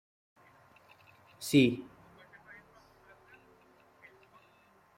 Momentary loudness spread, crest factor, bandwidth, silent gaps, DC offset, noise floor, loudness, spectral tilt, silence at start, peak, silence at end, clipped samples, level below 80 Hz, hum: 29 LU; 24 dB; 16 kHz; none; under 0.1%; -65 dBFS; -29 LUFS; -5.5 dB/octave; 1.4 s; -12 dBFS; 3.15 s; under 0.1%; -72 dBFS; none